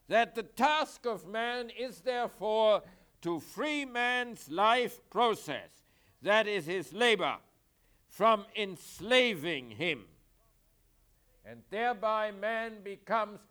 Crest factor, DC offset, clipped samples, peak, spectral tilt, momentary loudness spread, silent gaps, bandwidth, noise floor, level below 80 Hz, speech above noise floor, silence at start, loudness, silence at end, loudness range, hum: 20 dB; under 0.1%; under 0.1%; -12 dBFS; -3.5 dB/octave; 11 LU; none; over 20 kHz; -69 dBFS; -70 dBFS; 37 dB; 0.1 s; -31 LUFS; 0.15 s; 5 LU; none